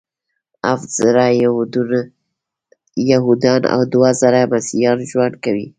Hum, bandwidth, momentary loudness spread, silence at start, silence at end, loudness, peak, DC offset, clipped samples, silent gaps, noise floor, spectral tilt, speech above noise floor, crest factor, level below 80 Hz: none; 9.4 kHz; 8 LU; 0.65 s; 0.1 s; -15 LUFS; 0 dBFS; under 0.1%; under 0.1%; none; -77 dBFS; -5.5 dB/octave; 62 dB; 16 dB; -58 dBFS